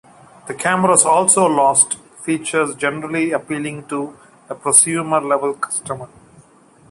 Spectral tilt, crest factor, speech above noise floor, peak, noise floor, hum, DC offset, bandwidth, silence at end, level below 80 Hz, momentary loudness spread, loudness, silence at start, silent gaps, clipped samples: -3 dB/octave; 18 dB; 32 dB; 0 dBFS; -49 dBFS; none; under 0.1%; 16 kHz; 0.85 s; -62 dBFS; 14 LU; -16 LUFS; 0.45 s; none; under 0.1%